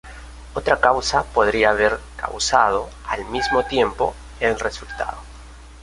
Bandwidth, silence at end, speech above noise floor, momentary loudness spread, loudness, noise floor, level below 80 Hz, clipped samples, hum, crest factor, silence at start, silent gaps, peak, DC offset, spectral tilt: 11.5 kHz; 0 s; 20 dB; 12 LU; -20 LUFS; -40 dBFS; -38 dBFS; under 0.1%; none; 20 dB; 0.05 s; none; 0 dBFS; under 0.1%; -3 dB/octave